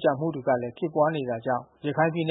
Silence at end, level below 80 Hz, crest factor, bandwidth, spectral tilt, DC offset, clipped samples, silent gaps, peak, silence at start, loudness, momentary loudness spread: 0 s; -70 dBFS; 18 dB; 4 kHz; -11 dB/octave; under 0.1%; under 0.1%; none; -8 dBFS; 0 s; -27 LUFS; 5 LU